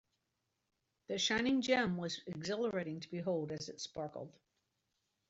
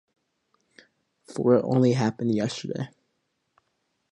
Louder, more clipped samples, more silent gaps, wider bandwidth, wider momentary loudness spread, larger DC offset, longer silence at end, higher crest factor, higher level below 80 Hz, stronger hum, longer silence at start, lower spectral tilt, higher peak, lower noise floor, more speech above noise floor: second, -37 LUFS vs -24 LUFS; neither; neither; second, 8 kHz vs 11 kHz; about the same, 12 LU vs 14 LU; neither; second, 1 s vs 1.25 s; about the same, 22 dB vs 20 dB; about the same, -72 dBFS vs -68 dBFS; neither; second, 1.1 s vs 1.3 s; second, -4 dB/octave vs -7 dB/octave; second, -18 dBFS vs -8 dBFS; first, -85 dBFS vs -76 dBFS; second, 48 dB vs 53 dB